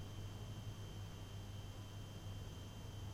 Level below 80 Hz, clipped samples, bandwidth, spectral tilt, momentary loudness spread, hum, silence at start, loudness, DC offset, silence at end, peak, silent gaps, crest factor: -58 dBFS; under 0.1%; 16 kHz; -5.5 dB/octave; 2 LU; none; 0 s; -51 LUFS; under 0.1%; 0 s; -36 dBFS; none; 12 dB